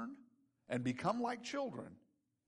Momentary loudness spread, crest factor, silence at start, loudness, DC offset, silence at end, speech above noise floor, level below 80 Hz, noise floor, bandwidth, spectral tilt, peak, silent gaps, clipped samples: 15 LU; 18 dB; 0 s; -41 LUFS; under 0.1%; 0.5 s; 29 dB; -80 dBFS; -69 dBFS; 11.5 kHz; -5.5 dB/octave; -24 dBFS; none; under 0.1%